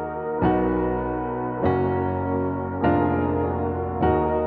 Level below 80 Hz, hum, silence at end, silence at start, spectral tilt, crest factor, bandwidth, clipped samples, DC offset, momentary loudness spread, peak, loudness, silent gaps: -40 dBFS; none; 0 s; 0 s; -8 dB/octave; 16 dB; 4.5 kHz; under 0.1%; under 0.1%; 6 LU; -8 dBFS; -24 LUFS; none